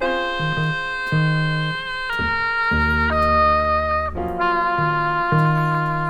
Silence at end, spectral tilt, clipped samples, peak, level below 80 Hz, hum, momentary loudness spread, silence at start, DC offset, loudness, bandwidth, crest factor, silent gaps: 0 s; -7 dB/octave; under 0.1%; -6 dBFS; -34 dBFS; none; 6 LU; 0 s; under 0.1%; -20 LUFS; 9.4 kHz; 14 dB; none